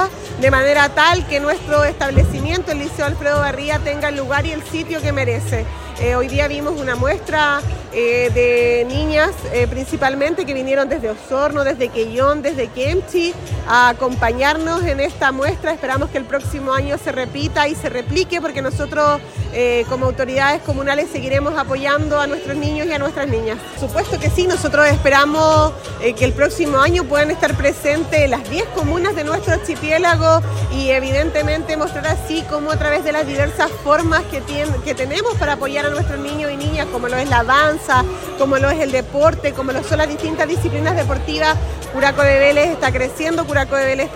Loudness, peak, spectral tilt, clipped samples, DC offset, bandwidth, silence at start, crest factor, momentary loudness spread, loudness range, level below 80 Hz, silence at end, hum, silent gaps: -17 LUFS; 0 dBFS; -5 dB/octave; under 0.1%; under 0.1%; 16.5 kHz; 0 s; 16 dB; 8 LU; 4 LU; -30 dBFS; 0 s; none; none